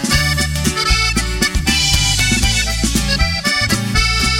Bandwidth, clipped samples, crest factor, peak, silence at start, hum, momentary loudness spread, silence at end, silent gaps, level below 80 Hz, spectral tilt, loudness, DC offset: 17.5 kHz; under 0.1%; 14 dB; -2 dBFS; 0 s; none; 3 LU; 0 s; none; -22 dBFS; -2.5 dB/octave; -14 LUFS; under 0.1%